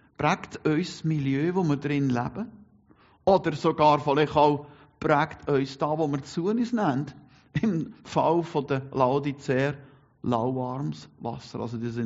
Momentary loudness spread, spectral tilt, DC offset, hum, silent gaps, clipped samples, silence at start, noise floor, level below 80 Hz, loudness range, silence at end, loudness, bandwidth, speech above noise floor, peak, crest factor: 12 LU; -6 dB/octave; under 0.1%; none; none; under 0.1%; 0.2 s; -59 dBFS; -58 dBFS; 3 LU; 0 s; -26 LUFS; 7.6 kHz; 33 dB; -6 dBFS; 20 dB